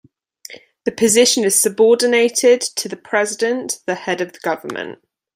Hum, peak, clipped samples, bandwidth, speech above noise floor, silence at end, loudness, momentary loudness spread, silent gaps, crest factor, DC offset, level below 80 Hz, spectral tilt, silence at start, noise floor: none; 0 dBFS; under 0.1%; 16 kHz; 26 dB; 0.4 s; -16 LUFS; 15 LU; none; 18 dB; under 0.1%; -64 dBFS; -2 dB/octave; 0.5 s; -42 dBFS